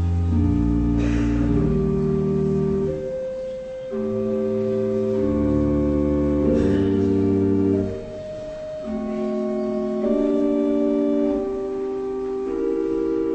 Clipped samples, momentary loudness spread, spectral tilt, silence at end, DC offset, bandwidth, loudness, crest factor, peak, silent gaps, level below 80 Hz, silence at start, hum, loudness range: under 0.1%; 9 LU; -9.5 dB/octave; 0 s; under 0.1%; 8.4 kHz; -22 LUFS; 12 dB; -8 dBFS; none; -34 dBFS; 0 s; none; 3 LU